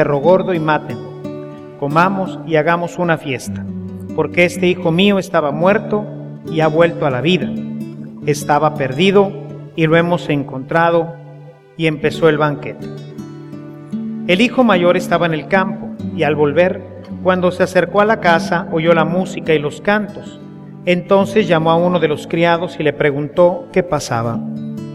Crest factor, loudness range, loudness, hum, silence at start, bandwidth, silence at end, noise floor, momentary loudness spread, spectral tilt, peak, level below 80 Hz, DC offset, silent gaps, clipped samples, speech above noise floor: 16 dB; 3 LU; -15 LUFS; none; 0 s; 14.5 kHz; 0 s; -38 dBFS; 15 LU; -6 dB/octave; 0 dBFS; -50 dBFS; under 0.1%; none; under 0.1%; 23 dB